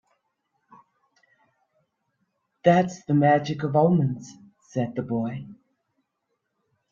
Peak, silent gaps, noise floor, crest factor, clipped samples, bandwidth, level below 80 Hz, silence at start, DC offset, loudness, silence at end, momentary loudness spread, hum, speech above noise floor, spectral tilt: -4 dBFS; none; -78 dBFS; 22 dB; under 0.1%; 7.4 kHz; -66 dBFS; 2.65 s; under 0.1%; -23 LUFS; 1.35 s; 13 LU; none; 56 dB; -7.5 dB/octave